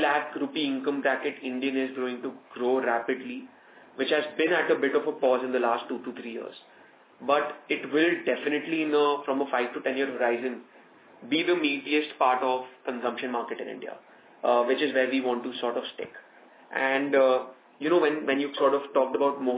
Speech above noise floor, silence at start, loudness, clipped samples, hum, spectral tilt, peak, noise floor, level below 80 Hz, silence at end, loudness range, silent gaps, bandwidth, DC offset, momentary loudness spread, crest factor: 27 dB; 0 s; -27 LUFS; under 0.1%; none; -8 dB/octave; -8 dBFS; -54 dBFS; -90 dBFS; 0 s; 3 LU; none; 4 kHz; under 0.1%; 13 LU; 18 dB